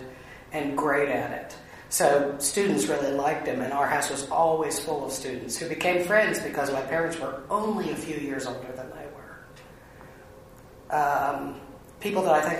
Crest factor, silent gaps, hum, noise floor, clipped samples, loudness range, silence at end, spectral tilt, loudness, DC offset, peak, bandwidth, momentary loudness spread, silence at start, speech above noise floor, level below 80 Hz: 20 dB; none; none; -49 dBFS; under 0.1%; 8 LU; 0 s; -3.5 dB/octave; -26 LUFS; under 0.1%; -8 dBFS; 15.5 kHz; 18 LU; 0 s; 22 dB; -58 dBFS